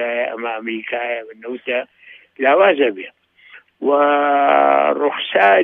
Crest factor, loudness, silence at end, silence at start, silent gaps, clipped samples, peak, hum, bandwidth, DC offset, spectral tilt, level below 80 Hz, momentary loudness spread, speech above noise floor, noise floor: 16 dB; -17 LUFS; 0 s; 0 s; none; under 0.1%; -2 dBFS; none; 4.2 kHz; under 0.1%; -6 dB/octave; -78 dBFS; 14 LU; 30 dB; -46 dBFS